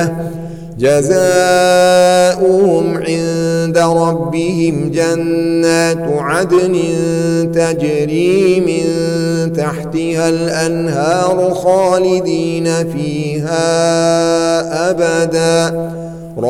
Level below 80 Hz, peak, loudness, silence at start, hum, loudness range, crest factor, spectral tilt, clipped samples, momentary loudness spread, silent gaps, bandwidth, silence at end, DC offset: -44 dBFS; 0 dBFS; -13 LUFS; 0 s; none; 3 LU; 12 dB; -5.5 dB/octave; under 0.1%; 7 LU; none; 16.5 kHz; 0 s; under 0.1%